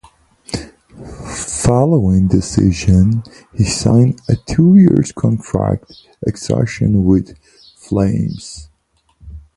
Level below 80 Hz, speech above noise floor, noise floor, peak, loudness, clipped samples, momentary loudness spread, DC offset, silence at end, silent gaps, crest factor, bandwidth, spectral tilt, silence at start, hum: -32 dBFS; 46 dB; -60 dBFS; 0 dBFS; -14 LUFS; under 0.1%; 15 LU; under 0.1%; 0.2 s; none; 14 dB; 11.5 kHz; -7 dB/octave; 0.5 s; none